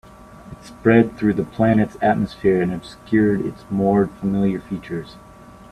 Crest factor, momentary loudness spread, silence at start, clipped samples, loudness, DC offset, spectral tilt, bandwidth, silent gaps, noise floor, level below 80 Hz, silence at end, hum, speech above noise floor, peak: 20 dB; 15 LU; 0.3 s; under 0.1%; -19 LUFS; under 0.1%; -8.5 dB/octave; 11 kHz; none; -41 dBFS; -48 dBFS; 0.55 s; none; 22 dB; 0 dBFS